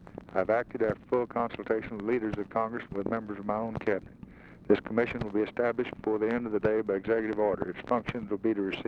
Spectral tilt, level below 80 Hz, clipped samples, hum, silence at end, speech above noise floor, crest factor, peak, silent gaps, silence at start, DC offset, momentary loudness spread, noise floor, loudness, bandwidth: -8.5 dB/octave; -56 dBFS; under 0.1%; none; 0 s; 20 dB; 20 dB; -10 dBFS; none; 0 s; under 0.1%; 6 LU; -50 dBFS; -31 LUFS; 6.6 kHz